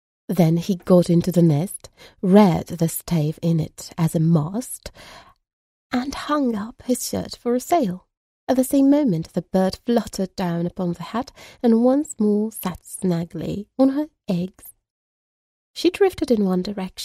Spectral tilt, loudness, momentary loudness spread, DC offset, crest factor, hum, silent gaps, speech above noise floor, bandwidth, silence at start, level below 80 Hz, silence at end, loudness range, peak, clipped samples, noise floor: -6.5 dB/octave; -21 LUFS; 12 LU; under 0.1%; 20 dB; none; 5.53-5.90 s, 8.17-8.47 s, 14.90-15.74 s; over 70 dB; 15.5 kHz; 0.3 s; -52 dBFS; 0 s; 6 LU; 0 dBFS; under 0.1%; under -90 dBFS